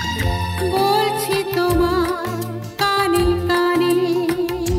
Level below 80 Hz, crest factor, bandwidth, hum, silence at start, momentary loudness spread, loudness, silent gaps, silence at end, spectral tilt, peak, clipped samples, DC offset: -34 dBFS; 14 dB; 16 kHz; none; 0 s; 5 LU; -19 LUFS; none; 0 s; -5 dB/octave; -6 dBFS; under 0.1%; under 0.1%